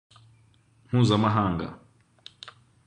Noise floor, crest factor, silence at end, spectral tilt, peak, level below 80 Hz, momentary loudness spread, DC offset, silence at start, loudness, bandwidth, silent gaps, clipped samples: -61 dBFS; 20 dB; 0.35 s; -7 dB/octave; -8 dBFS; -52 dBFS; 24 LU; under 0.1%; 0.9 s; -24 LUFS; 9.4 kHz; none; under 0.1%